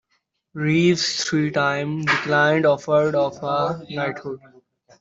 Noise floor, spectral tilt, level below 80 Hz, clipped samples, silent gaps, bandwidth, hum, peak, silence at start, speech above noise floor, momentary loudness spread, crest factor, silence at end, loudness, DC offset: -71 dBFS; -5 dB/octave; -62 dBFS; under 0.1%; none; 8 kHz; none; -6 dBFS; 0.55 s; 50 dB; 10 LU; 16 dB; 0.65 s; -20 LUFS; under 0.1%